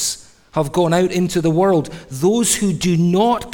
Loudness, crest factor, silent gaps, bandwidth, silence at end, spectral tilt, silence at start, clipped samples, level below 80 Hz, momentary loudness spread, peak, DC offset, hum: -17 LUFS; 14 dB; none; 18.5 kHz; 0 s; -5 dB/octave; 0 s; under 0.1%; -46 dBFS; 8 LU; -2 dBFS; under 0.1%; none